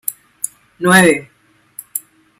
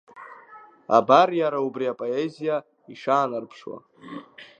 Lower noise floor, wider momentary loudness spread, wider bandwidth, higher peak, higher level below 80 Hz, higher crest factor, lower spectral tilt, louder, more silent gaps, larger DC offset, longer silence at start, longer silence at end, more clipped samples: second, -39 dBFS vs -49 dBFS; second, 19 LU vs 25 LU; first, 16.5 kHz vs 7.8 kHz; about the same, 0 dBFS vs -2 dBFS; first, -56 dBFS vs -80 dBFS; second, 18 dB vs 24 dB; second, -4 dB/octave vs -6 dB/octave; first, -15 LUFS vs -23 LUFS; neither; neither; about the same, 0.05 s vs 0.15 s; first, 0.4 s vs 0.15 s; neither